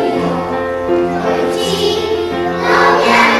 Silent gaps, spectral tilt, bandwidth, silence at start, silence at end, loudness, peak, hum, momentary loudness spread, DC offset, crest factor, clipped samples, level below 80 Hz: none; -4.5 dB/octave; 13 kHz; 0 s; 0 s; -14 LUFS; 0 dBFS; none; 8 LU; under 0.1%; 12 dB; under 0.1%; -42 dBFS